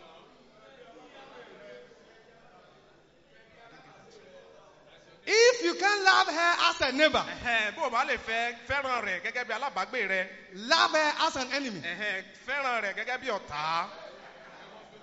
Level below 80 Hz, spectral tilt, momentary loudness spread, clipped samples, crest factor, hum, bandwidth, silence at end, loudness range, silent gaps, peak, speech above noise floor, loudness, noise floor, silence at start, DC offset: -64 dBFS; 0.5 dB/octave; 25 LU; under 0.1%; 24 dB; none; 8 kHz; 0.05 s; 7 LU; none; -8 dBFS; 30 dB; -27 LUFS; -60 dBFS; 0 s; under 0.1%